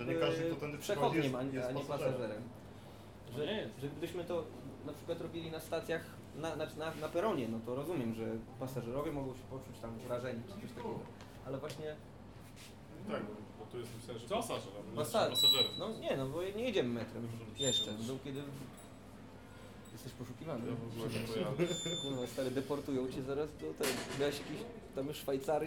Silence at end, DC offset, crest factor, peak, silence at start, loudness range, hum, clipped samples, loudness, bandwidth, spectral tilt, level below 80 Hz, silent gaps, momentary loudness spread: 0 s; under 0.1%; 20 dB; -18 dBFS; 0 s; 11 LU; none; under 0.1%; -38 LUFS; 19 kHz; -4.5 dB/octave; -64 dBFS; none; 16 LU